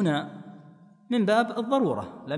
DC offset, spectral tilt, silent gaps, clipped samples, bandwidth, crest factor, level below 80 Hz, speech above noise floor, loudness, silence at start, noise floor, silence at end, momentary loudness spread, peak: under 0.1%; -6.5 dB/octave; none; under 0.1%; 10.5 kHz; 16 dB; -70 dBFS; 27 dB; -26 LUFS; 0 s; -52 dBFS; 0 s; 19 LU; -10 dBFS